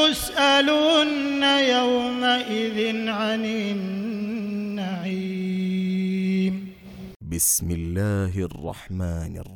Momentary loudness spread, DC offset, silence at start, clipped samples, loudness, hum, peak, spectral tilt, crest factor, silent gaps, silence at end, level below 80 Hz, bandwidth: 13 LU; under 0.1%; 0 s; under 0.1%; -23 LUFS; none; -6 dBFS; -4 dB/octave; 16 dB; 7.16-7.20 s; 0 s; -46 dBFS; 19 kHz